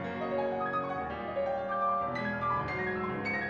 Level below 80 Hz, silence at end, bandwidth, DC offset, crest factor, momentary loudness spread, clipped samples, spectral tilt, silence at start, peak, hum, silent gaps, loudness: -58 dBFS; 0 s; 7.4 kHz; under 0.1%; 12 dB; 4 LU; under 0.1%; -7.5 dB/octave; 0 s; -20 dBFS; none; none; -33 LUFS